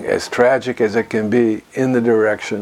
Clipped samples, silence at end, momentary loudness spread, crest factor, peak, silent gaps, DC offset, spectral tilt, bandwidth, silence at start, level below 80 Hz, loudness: under 0.1%; 0 s; 4 LU; 16 dB; 0 dBFS; none; under 0.1%; -6 dB/octave; 13.5 kHz; 0 s; -56 dBFS; -17 LUFS